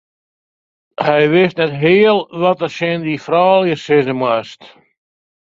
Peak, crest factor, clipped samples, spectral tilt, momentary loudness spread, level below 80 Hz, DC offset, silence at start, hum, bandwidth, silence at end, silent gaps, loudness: 0 dBFS; 16 dB; under 0.1%; -7 dB/octave; 9 LU; -58 dBFS; under 0.1%; 1 s; none; 7.6 kHz; 0.9 s; none; -14 LUFS